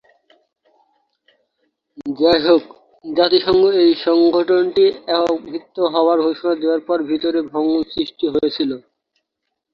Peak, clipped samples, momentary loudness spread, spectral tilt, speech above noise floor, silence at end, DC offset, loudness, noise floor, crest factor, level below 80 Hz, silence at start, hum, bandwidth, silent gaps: -2 dBFS; under 0.1%; 10 LU; -6.5 dB/octave; 61 dB; 0.95 s; under 0.1%; -17 LUFS; -77 dBFS; 16 dB; -56 dBFS; 2 s; none; 5.8 kHz; none